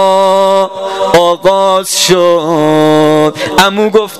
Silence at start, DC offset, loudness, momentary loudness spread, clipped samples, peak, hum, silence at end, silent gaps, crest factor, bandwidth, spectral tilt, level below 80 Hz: 0 s; 1%; -9 LUFS; 3 LU; 0.8%; 0 dBFS; none; 0 s; none; 8 dB; 16.5 kHz; -4 dB/octave; -44 dBFS